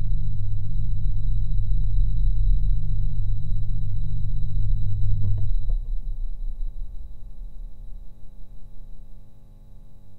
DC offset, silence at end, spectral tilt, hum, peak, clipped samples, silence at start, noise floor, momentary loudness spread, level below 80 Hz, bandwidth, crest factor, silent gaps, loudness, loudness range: under 0.1%; 0 s; -10 dB/octave; 50 Hz at -35 dBFS; -6 dBFS; under 0.1%; 0 s; -41 dBFS; 22 LU; -26 dBFS; 4 kHz; 12 dB; none; -29 LUFS; 15 LU